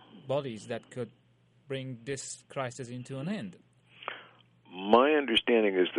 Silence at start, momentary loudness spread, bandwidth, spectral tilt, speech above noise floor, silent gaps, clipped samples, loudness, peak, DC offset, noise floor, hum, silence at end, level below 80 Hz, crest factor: 0.15 s; 18 LU; 11.5 kHz; -4.5 dB/octave; 29 dB; none; under 0.1%; -30 LUFS; -8 dBFS; under 0.1%; -58 dBFS; none; 0 s; -68 dBFS; 22 dB